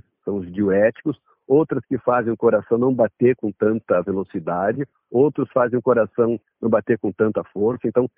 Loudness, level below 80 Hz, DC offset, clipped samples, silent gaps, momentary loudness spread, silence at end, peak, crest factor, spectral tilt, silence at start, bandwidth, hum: -20 LUFS; -60 dBFS; under 0.1%; under 0.1%; none; 8 LU; 0.1 s; -4 dBFS; 16 dB; -8.5 dB/octave; 0.25 s; 3.6 kHz; none